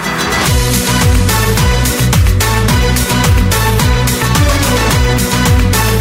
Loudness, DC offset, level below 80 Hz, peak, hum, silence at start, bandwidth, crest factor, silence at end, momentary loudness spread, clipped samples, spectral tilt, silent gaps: -11 LUFS; under 0.1%; -16 dBFS; 0 dBFS; none; 0 s; 16.5 kHz; 10 dB; 0 s; 1 LU; under 0.1%; -4 dB/octave; none